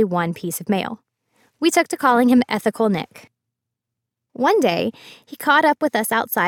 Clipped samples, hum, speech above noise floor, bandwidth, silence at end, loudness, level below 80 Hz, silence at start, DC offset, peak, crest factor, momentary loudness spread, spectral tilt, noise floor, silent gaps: under 0.1%; none; 63 dB; 18 kHz; 0 s; -19 LUFS; -64 dBFS; 0 s; under 0.1%; -2 dBFS; 18 dB; 11 LU; -4.5 dB/octave; -82 dBFS; none